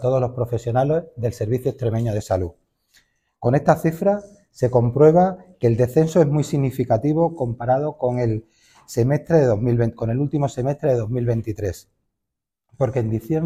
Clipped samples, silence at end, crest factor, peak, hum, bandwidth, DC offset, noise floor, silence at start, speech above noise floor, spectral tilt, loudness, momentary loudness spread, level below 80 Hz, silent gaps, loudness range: under 0.1%; 0 s; 18 dB; -2 dBFS; none; 15 kHz; under 0.1%; -83 dBFS; 0 s; 64 dB; -8.5 dB/octave; -21 LUFS; 8 LU; -48 dBFS; none; 5 LU